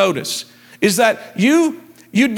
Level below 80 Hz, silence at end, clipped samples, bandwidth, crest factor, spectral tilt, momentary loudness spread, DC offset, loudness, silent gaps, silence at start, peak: -66 dBFS; 0 s; under 0.1%; 18.5 kHz; 16 dB; -4 dB/octave; 12 LU; under 0.1%; -17 LUFS; none; 0 s; 0 dBFS